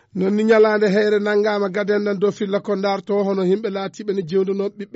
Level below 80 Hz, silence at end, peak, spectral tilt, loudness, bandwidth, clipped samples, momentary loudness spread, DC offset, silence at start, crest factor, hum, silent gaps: -66 dBFS; 0.1 s; -6 dBFS; -5 dB/octave; -19 LUFS; 8 kHz; under 0.1%; 9 LU; under 0.1%; 0.15 s; 14 dB; none; none